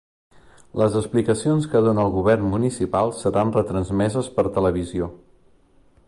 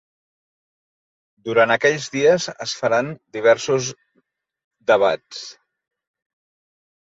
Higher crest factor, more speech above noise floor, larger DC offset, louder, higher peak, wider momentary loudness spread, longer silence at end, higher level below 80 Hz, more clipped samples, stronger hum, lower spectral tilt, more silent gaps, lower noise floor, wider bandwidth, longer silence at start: about the same, 16 dB vs 20 dB; second, 35 dB vs 48 dB; neither; about the same, -21 LUFS vs -19 LUFS; second, -6 dBFS vs -2 dBFS; second, 6 LU vs 14 LU; second, 0.9 s vs 1.5 s; first, -44 dBFS vs -68 dBFS; neither; neither; first, -7 dB/octave vs -3.5 dB/octave; second, none vs 4.64-4.71 s; second, -55 dBFS vs -67 dBFS; first, 11.5 kHz vs 8 kHz; second, 0.75 s vs 1.45 s